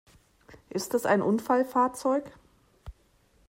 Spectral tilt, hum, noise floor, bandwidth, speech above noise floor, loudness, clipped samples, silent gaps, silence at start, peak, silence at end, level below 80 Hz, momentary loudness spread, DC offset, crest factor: -5.5 dB/octave; none; -64 dBFS; 16 kHz; 38 dB; -27 LUFS; under 0.1%; none; 0.5 s; -12 dBFS; 0.55 s; -58 dBFS; 8 LU; under 0.1%; 18 dB